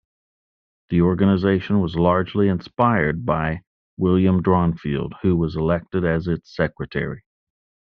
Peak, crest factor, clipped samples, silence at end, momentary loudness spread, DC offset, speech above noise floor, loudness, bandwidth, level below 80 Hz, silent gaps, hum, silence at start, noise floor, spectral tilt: -2 dBFS; 18 dB; under 0.1%; 0.75 s; 9 LU; under 0.1%; over 70 dB; -21 LUFS; 5.6 kHz; -46 dBFS; 3.67-3.97 s; none; 0.9 s; under -90 dBFS; -7 dB/octave